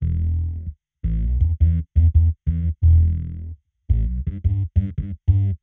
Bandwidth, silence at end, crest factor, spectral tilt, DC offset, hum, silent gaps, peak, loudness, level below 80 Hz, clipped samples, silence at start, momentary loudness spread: 2.2 kHz; 0.05 s; 14 dB; -12.5 dB/octave; under 0.1%; none; none; -6 dBFS; -21 LUFS; -22 dBFS; under 0.1%; 0 s; 13 LU